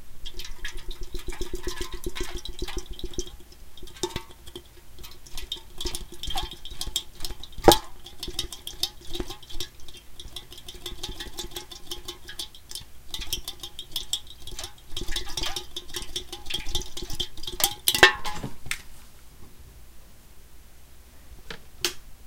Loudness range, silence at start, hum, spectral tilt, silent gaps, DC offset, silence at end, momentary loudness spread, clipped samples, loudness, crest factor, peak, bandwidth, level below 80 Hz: 13 LU; 0 s; none; -2 dB/octave; none; under 0.1%; 0 s; 20 LU; under 0.1%; -29 LUFS; 30 dB; 0 dBFS; 17 kHz; -38 dBFS